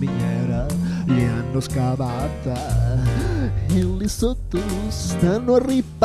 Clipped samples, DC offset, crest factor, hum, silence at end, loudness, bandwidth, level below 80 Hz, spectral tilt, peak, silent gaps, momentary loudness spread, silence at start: under 0.1%; 0.1%; 16 dB; none; 0 s; -22 LUFS; 14 kHz; -30 dBFS; -7 dB/octave; -4 dBFS; none; 7 LU; 0 s